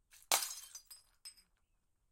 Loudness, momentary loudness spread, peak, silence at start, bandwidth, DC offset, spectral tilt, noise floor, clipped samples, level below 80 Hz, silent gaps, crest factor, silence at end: -36 LUFS; 21 LU; -10 dBFS; 0.15 s; 16.5 kHz; under 0.1%; 2.5 dB/octave; -78 dBFS; under 0.1%; -78 dBFS; none; 34 dB; 0.8 s